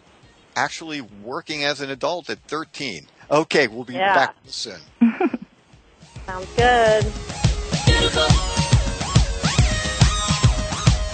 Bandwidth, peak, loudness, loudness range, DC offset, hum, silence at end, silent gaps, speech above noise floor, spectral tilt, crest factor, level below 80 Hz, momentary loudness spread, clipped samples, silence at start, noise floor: 9 kHz; -2 dBFS; -20 LUFS; 5 LU; under 0.1%; none; 0 s; none; 31 dB; -4.5 dB/octave; 18 dB; -28 dBFS; 13 LU; under 0.1%; 0.55 s; -52 dBFS